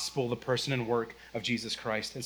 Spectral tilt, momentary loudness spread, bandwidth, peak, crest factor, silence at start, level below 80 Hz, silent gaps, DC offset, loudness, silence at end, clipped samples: -4.5 dB/octave; 4 LU; over 20 kHz; -16 dBFS; 18 dB; 0 s; -62 dBFS; none; under 0.1%; -32 LUFS; 0 s; under 0.1%